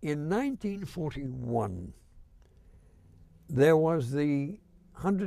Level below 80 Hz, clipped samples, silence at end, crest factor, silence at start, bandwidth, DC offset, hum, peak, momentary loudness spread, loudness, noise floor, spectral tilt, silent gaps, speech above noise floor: -54 dBFS; under 0.1%; 0 s; 18 dB; 0 s; 14.5 kHz; under 0.1%; none; -12 dBFS; 15 LU; -30 LUFS; -57 dBFS; -8 dB/octave; none; 28 dB